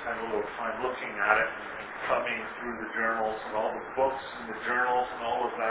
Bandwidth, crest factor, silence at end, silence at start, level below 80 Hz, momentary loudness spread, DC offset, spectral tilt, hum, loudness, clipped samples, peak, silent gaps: 4 kHz; 24 dB; 0 s; 0 s; -62 dBFS; 10 LU; under 0.1%; -1.5 dB/octave; none; -30 LUFS; under 0.1%; -6 dBFS; none